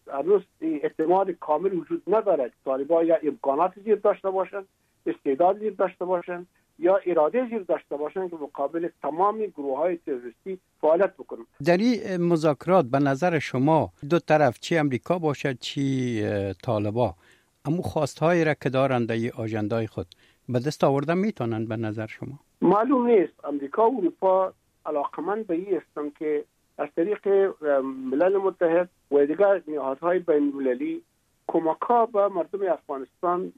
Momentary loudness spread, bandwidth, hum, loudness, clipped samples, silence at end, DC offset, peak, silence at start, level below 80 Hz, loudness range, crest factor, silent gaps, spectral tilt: 10 LU; 13 kHz; none; -25 LUFS; under 0.1%; 0.05 s; under 0.1%; -6 dBFS; 0.05 s; -66 dBFS; 4 LU; 18 dB; none; -7.5 dB/octave